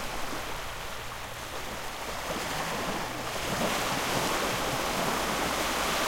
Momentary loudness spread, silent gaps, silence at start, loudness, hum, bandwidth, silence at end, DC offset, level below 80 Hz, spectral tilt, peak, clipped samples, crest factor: 9 LU; none; 0 s; -31 LUFS; none; 16.5 kHz; 0 s; under 0.1%; -46 dBFS; -2.5 dB/octave; -14 dBFS; under 0.1%; 16 dB